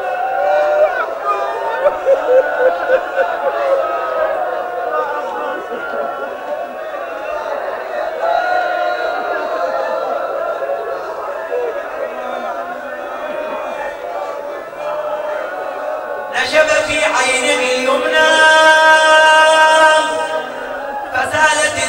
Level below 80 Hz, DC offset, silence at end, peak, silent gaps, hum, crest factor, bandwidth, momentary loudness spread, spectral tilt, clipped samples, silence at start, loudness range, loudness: -54 dBFS; under 0.1%; 0 s; 0 dBFS; none; none; 16 dB; 16.5 kHz; 15 LU; -1 dB/octave; under 0.1%; 0 s; 13 LU; -15 LUFS